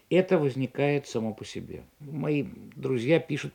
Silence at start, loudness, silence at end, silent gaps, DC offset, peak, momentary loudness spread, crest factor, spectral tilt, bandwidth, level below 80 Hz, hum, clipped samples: 0.1 s; -28 LUFS; 0.05 s; none; under 0.1%; -10 dBFS; 15 LU; 18 dB; -7 dB/octave; 18 kHz; -66 dBFS; none; under 0.1%